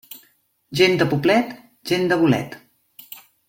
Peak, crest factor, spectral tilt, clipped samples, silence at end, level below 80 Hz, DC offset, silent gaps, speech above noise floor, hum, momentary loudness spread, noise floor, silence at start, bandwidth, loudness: -2 dBFS; 20 dB; -5.5 dB/octave; under 0.1%; 0.3 s; -58 dBFS; under 0.1%; none; 42 dB; none; 23 LU; -61 dBFS; 0.1 s; 17 kHz; -19 LUFS